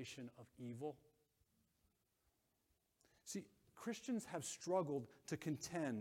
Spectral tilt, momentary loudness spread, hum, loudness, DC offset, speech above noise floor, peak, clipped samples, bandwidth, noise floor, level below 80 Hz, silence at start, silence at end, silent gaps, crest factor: -5 dB/octave; 14 LU; none; -47 LUFS; under 0.1%; 38 dB; -28 dBFS; under 0.1%; 16.5 kHz; -84 dBFS; -84 dBFS; 0 s; 0 s; none; 20 dB